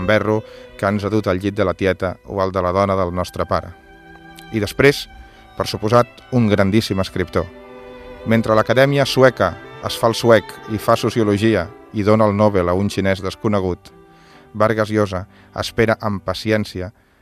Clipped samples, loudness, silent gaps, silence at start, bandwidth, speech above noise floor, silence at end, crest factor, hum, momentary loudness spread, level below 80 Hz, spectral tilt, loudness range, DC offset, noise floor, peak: under 0.1%; -18 LUFS; none; 0 s; 15 kHz; 28 dB; 0.3 s; 18 dB; none; 13 LU; -46 dBFS; -6 dB/octave; 4 LU; under 0.1%; -46 dBFS; 0 dBFS